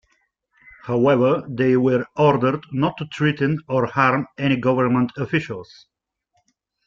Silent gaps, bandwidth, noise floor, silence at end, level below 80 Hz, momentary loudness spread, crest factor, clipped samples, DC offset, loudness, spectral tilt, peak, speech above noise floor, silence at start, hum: none; 7.4 kHz; -70 dBFS; 1.25 s; -56 dBFS; 7 LU; 18 dB; under 0.1%; under 0.1%; -20 LUFS; -8 dB/octave; -4 dBFS; 51 dB; 0.85 s; none